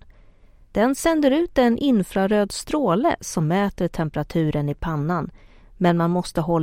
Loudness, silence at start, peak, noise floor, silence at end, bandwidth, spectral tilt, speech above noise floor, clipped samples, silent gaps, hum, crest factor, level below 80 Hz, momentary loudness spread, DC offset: -22 LUFS; 0.75 s; -4 dBFS; -50 dBFS; 0 s; 16.5 kHz; -6 dB/octave; 29 dB; under 0.1%; none; none; 18 dB; -44 dBFS; 7 LU; under 0.1%